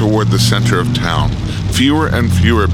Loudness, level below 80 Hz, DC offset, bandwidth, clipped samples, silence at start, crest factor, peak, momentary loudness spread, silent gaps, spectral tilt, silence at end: -13 LUFS; -26 dBFS; under 0.1%; 16 kHz; under 0.1%; 0 s; 12 dB; 0 dBFS; 5 LU; none; -5.5 dB/octave; 0 s